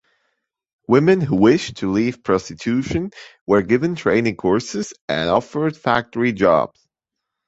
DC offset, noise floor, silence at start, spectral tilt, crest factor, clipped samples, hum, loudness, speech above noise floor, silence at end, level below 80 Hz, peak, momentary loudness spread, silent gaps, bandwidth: under 0.1%; -82 dBFS; 0.9 s; -6 dB/octave; 18 dB; under 0.1%; none; -19 LUFS; 64 dB; 0.8 s; -48 dBFS; -2 dBFS; 10 LU; 3.41-3.46 s, 5.01-5.08 s; 8 kHz